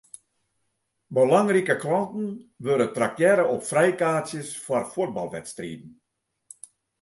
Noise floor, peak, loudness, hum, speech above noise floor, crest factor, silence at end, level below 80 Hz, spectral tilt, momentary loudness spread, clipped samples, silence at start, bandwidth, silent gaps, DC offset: -75 dBFS; -6 dBFS; -24 LUFS; none; 52 dB; 20 dB; 1.1 s; -68 dBFS; -5.5 dB/octave; 16 LU; under 0.1%; 1.1 s; 11.5 kHz; none; under 0.1%